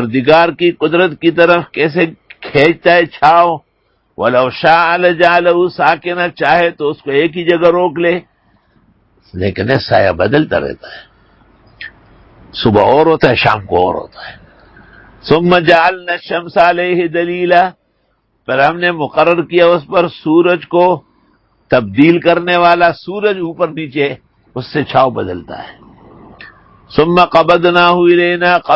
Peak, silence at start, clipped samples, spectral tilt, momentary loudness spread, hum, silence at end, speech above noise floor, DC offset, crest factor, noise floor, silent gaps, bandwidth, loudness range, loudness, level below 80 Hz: 0 dBFS; 0 s; 0.2%; -7.5 dB/octave; 13 LU; none; 0 s; 49 dB; under 0.1%; 12 dB; -60 dBFS; none; 8 kHz; 5 LU; -11 LUFS; -44 dBFS